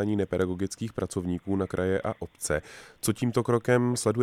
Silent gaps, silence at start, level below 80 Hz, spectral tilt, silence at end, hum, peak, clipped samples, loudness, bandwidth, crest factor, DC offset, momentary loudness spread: none; 0 s; -54 dBFS; -5.5 dB/octave; 0 s; none; -10 dBFS; under 0.1%; -28 LUFS; 16 kHz; 18 dB; under 0.1%; 8 LU